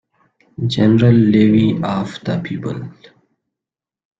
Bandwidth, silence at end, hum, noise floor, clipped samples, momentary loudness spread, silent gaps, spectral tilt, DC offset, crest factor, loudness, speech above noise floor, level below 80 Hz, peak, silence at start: 7.8 kHz; 1.3 s; none; -88 dBFS; under 0.1%; 14 LU; none; -8.5 dB/octave; under 0.1%; 16 dB; -15 LUFS; 73 dB; -48 dBFS; -2 dBFS; 0.6 s